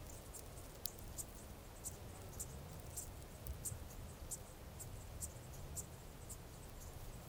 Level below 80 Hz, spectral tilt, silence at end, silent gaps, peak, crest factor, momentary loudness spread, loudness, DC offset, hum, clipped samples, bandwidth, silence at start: -56 dBFS; -3.5 dB/octave; 0 s; none; -16 dBFS; 36 dB; 7 LU; -51 LUFS; under 0.1%; none; under 0.1%; 18 kHz; 0 s